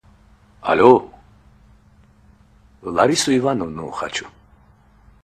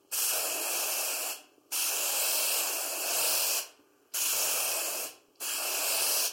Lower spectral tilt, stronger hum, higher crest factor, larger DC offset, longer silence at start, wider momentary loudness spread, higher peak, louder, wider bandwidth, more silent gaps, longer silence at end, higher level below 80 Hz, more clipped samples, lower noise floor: first, -4.5 dB/octave vs 2.5 dB/octave; neither; about the same, 22 dB vs 18 dB; neither; first, 0.65 s vs 0.1 s; first, 16 LU vs 10 LU; first, 0 dBFS vs -14 dBFS; first, -18 LUFS vs -28 LUFS; second, 13.5 kHz vs 17 kHz; neither; first, 0.95 s vs 0 s; first, -52 dBFS vs -88 dBFS; neither; about the same, -52 dBFS vs -55 dBFS